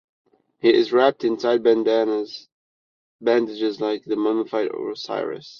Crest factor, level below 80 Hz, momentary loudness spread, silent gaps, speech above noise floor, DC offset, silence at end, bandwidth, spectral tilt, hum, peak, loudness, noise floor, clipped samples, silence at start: 18 dB; -70 dBFS; 9 LU; 2.52-3.19 s; over 69 dB; under 0.1%; 0 s; 6.8 kHz; -5.5 dB/octave; none; -4 dBFS; -21 LUFS; under -90 dBFS; under 0.1%; 0.65 s